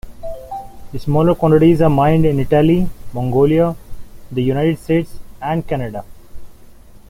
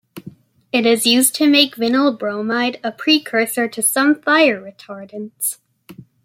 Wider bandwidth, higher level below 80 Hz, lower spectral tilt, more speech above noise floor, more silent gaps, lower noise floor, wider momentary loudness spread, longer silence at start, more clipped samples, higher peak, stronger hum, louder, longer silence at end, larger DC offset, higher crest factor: about the same, 16 kHz vs 16.5 kHz; first, -34 dBFS vs -68 dBFS; first, -9 dB/octave vs -2 dB/octave; about the same, 25 dB vs 25 dB; neither; about the same, -39 dBFS vs -42 dBFS; first, 20 LU vs 17 LU; about the same, 0.05 s vs 0.15 s; neither; about the same, -2 dBFS vs 0 dBFS; neither; about the same, -15 LUFS vs -16 LUFS; about the same, 0.1 s vs 0.2 s; neither; about the same, 14 dB vs 18 dB